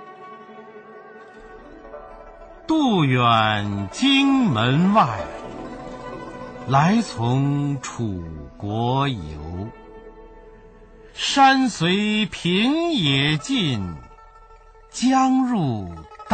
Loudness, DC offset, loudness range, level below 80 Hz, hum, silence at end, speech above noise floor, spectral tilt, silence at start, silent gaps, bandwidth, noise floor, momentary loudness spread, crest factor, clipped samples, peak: -20 LUFS; under 0.1%; 7 LU; -48 dBFS; none; 0 s; 27 dB; -5.5 dB/octave; 0 s; none; 9.2 kHz; -47 dBFS; 23 LU; 16 dB; under 0.1%; -6 dBFS